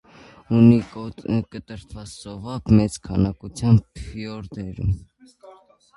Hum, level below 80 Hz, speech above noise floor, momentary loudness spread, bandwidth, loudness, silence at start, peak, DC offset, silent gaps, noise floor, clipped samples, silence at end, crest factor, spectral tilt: none; -40 dBFS; 29 dB; 21 LU; 11.5 kHz; -21 LUFS; 0.5 s; -2 dBFS; under 0.1%; none; -50 dBFS; under 0.1%; 0.45 s; 20 dB; -8 dB/octave